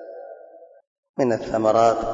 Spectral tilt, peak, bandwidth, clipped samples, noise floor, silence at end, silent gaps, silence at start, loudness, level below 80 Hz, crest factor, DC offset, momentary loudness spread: -6 dB/octave; -6 dBFS; 7.8 kHz; under 0.1%; -47 dBFS; 0 s; 0.87-1.03 s, 1.09-1.14 s; 0 s; -20 LUFS; -50 dBFS; 18 dB; under 0.1%; 22 LU